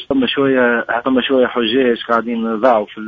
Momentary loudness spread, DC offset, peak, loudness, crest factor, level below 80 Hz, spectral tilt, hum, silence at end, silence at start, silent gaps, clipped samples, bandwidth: 3 LU; under 0.1%; 0 dBFS; -15 LUFS; 16 dB; -52 dBFS; -7 dB/octave; none; 0 s; 0 s; none; under 0.1%; 5.8 kHz